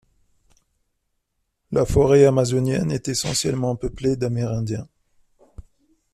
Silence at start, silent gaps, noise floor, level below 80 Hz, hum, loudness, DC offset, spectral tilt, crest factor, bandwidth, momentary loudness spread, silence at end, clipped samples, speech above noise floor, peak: 1.7 s; none; -74 dBFS; -40 dBFS; none; -21 LUFS; under 0.1%; -5.5 dB/octave; 18 dB; 14 kHz; 11 LU; 0.55 s; under 0.1%; 55 dB; -4 dBFS